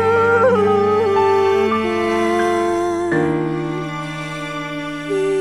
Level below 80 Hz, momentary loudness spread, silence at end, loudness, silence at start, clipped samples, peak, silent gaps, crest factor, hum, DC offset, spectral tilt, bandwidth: -48 dBFS; 11 LU; 0 s; -18 LUFS; 0 s; under 0.1%; -4 dBFS; none; 12 dB; none; under 0.1%; -6 dB/octave; 12.5 kHz